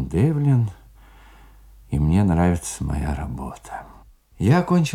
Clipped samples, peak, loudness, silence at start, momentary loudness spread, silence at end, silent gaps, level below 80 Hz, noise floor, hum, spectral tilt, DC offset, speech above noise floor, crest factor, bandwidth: under 0.1%; -4 dBFS; -21 LUFS; 0 s; 16 LU; 0 s; none; -36 dBFS; -47 dBFS; none; -7 dB/octave; under 0.1%; 27 dB; 18 dB; 14.5 kHz